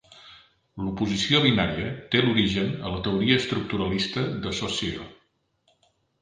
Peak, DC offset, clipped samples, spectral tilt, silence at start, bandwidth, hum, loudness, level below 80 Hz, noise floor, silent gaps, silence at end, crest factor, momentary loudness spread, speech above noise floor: -6 dBFS; under 0.1%; under 0.1%; -5 dB/octave; 0.1 s; 9.6 kHz; none; -24 LUFS; -48 dBFS; -68 dBFS; none; 1.05 s; 22 dB; 12 LU; 44 dB